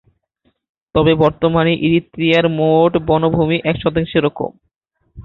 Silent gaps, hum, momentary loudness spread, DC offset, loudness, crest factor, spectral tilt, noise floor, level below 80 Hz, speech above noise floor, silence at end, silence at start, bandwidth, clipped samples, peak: 4.76-4.81 s; none; 6 LU; under 0.1%; -15 LUFS; 14 dB; -8.5 dB/octave; -66 dBFS; -42 dBFS; 51 dB; 0.05 s; 0.95 s; 6.4 kHz; under 0.1%; -2 dBFS